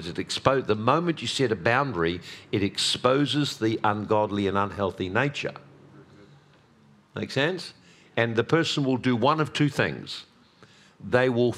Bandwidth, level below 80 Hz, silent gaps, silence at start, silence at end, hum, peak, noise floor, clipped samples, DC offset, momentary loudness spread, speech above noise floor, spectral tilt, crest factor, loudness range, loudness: 14 kHz; -60 dBFS; none; 0 s; 0 s; none; -2 dBFS; -57 dBFS; under 0.1%; under 0.1%; 12 LU; 32 dB; -5 dB/octave; 24 dB; 6 LU; -25 LUFS